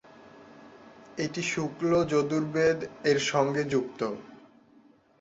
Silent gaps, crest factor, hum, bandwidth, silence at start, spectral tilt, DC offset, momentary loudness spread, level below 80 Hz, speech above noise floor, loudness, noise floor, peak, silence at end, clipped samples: none; 20 dB; none; 8 kHz; 0.25 s; -5 dB/octave; under 0.1%; 9 LU; -64 dBFS; 32 dB; -28 LUFS; -59 dBFS; -10 dBFS; 0.85 s; under 0.1%